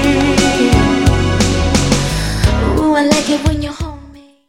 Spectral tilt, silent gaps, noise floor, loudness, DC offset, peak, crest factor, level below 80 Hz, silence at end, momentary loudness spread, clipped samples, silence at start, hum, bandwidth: -5 dB/octave; none; -38 dBFS; -13 LUFS; under 0.1%; 0 dBFS; 14 dB; -22 dBFS; 0.3 s; 7 LU; under 0.1%; 0 s; none; 16.5 kHz